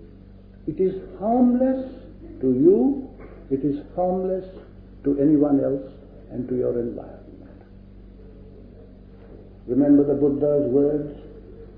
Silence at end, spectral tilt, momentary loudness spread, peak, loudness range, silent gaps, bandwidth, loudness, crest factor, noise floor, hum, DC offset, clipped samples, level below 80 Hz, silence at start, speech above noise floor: 0.05 s; -13 dB/octave; 24 LU; -6 dBFS; 10 LU; none; 3.9 kHz; -22 LUFS; 18 dB; -45 dBFS; none; under 0.1%; under 0.1%; -46 dBFS; 0 s; 24 dB